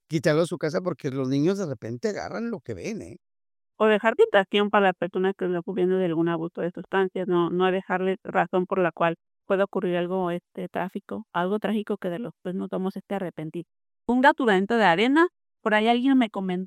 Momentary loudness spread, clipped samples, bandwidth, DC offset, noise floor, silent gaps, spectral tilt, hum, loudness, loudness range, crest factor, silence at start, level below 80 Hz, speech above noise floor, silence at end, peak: 13 LU; under 0.1%; 13 kHz; under 0.1%; under -90 dBFS; none; -6.5 dB/octave; none; -25 LUFS; 6 LU; 20 dB; 0.1 s; -68 dBFS; over 66 dB; 0 s; -6 dBFS